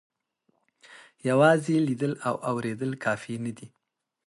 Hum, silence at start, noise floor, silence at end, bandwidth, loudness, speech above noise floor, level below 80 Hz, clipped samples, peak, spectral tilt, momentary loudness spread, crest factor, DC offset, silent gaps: none; 0.9 s; -73 dBFS; 0.6 s; 11.5 kHz; -26 LUFS; 48 dB; -72 dBFS; under 0.1%; -8 dBFS; -6.5 dB/octave; 14 LU; 20 dB; under 0.1%; none